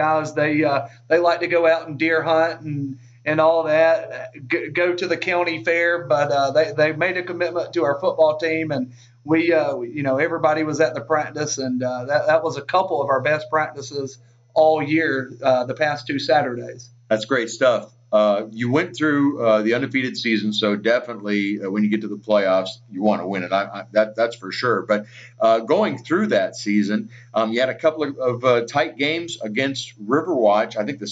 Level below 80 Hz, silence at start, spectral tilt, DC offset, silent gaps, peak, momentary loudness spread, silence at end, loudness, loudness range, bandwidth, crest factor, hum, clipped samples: -70 dBFS; 0 s; -5 dB/octave; under 0.1%; none; -6 dBFS; 7 LU; 0 s; -20 LUFS; 2 LU; 8 kHz; 14 dB; none; under 0.1%